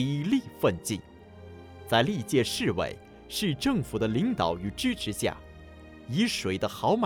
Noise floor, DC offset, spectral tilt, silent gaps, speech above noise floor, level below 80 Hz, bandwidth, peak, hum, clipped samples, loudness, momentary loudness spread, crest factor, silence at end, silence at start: -48 dBFS; under 0.1%; -5 dB/octave; none; 20 dB; -52 dBFS; over 20 kHz; -10 dBFS; none; under 0.1%; -28 LUFS; 21 LU; 20 dB; 0 s; 0 s